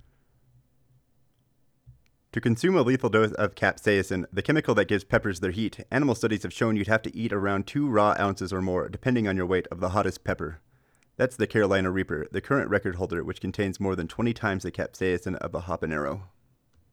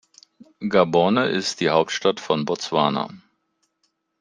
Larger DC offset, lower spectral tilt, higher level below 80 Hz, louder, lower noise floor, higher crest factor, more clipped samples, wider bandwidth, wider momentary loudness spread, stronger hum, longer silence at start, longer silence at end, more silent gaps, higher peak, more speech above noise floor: neither; first, -6.5 dB/octave vs -4.5 dB/octave; first, -52 dBFS vs -64 dBFS; second, -27 LUFS vs -21 LUFS; second, -67 dBFS vs -72 dBFS; about the same, 20 dB vs 20 dB; neither; first, 15.5 kHz vs 10 kHz; about the same, 9 LU vs 7 LU; neither; first, 1.85 s vs 0.6 s; second, 0.65 s vs 1.05 s; neither; second, -8 dBFS vs -2 dBFS; second, 41 dB vs 51 dB